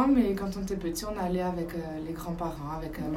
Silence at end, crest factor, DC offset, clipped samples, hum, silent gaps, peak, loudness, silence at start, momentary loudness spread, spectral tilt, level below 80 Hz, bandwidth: 0 s; 18 dB; under 0.1%; under 0.1%; none; none; -12 dBFS; -32 LUFS; 0 s; 9 LU; -6.5 dB/octave; -44 dBFS; 16 kHz